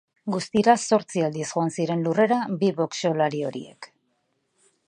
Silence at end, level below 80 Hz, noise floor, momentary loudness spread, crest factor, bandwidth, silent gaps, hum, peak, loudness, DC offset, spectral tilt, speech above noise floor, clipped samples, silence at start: 1 s; -68 dBFS; -72 dBFS; 11 LU; 22 dB; 10.5 kHz; none; none; -4 dBFS; -24 LUFS; under 0.1%; -5.5 dB/octave; 49 dB; under 0.1%; 0.25 s